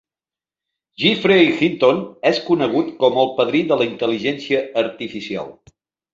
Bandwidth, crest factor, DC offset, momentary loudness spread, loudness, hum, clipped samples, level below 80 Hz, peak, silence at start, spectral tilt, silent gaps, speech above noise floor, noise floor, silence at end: 7.6 kHz; 18 dB; under 0.1%; 13 LU; -18 LUFS; none; under 0.1%; -60 dBFS; -2 dBFS; 1 s; -6 dB/octave; none; over 72 dB; under -90 dBFS; 0.6 s